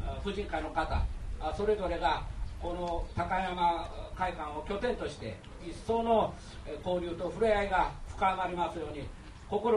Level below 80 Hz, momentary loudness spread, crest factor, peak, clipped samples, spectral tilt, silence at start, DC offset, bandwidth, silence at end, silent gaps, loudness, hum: -42 dBFS; 13 LU; 18 dB; -16 dBFS; under 0.1%; -6 dB/octave; 0 s; under 0.1%; 11.5 kHz; 0 s; none; -33 LUFS; none